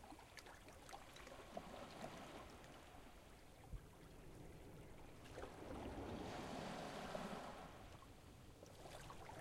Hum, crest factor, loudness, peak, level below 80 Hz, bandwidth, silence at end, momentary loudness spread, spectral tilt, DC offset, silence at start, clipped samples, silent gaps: none; 20 dB; -56 LUFS; -36 dBFS; -64 dBFS; 16 kHz; 0 s; 12 LU; -5 dB/octave; under 0.1%; 0 s; under 0.1%; none